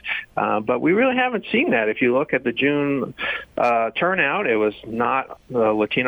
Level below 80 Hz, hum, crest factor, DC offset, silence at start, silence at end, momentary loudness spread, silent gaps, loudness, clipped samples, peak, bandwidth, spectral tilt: -58 dBFS; none; 14 dB; under 0.1%; 0.05 s; 0 s; 6 LU; none; -21 LUFS; under 0.1%; -6 dBFS; over 20 kHz; -7 dB/octave